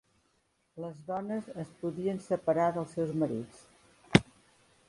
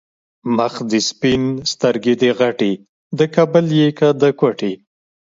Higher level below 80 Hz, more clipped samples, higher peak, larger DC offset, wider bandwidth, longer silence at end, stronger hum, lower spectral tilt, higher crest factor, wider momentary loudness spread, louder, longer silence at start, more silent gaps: second, -60 dBFS vs -54 dBFS; neither; second, -4 dBFS vs 0 dBFS; neither; first, 11.5 kHz vs 7.8 kHz; first, 0.65 s vs 0.45 s; neither; about the same, -6.5 dB/octave vs -5.5 dB/octave; first, 30 dB vs 16 dB; first, 16 LU vs 10 LU; second, -32 LUFS vs -16 LUFS; first, 0.75 s vs 0.45 s; second, none vs 2.89-3.10 s